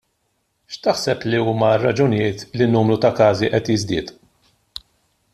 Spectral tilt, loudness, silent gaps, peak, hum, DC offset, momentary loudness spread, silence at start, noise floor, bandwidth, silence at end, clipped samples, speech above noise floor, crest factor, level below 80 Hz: -6 dB/octave; -18 LUFS; none; -2 dBFS; none; under 0.1%; 21 LU; 0.7 s; -69 dBFS; 13 kHz; 1.2 s; under 0.1%; 51 dB; 16 dB; -52 dBFS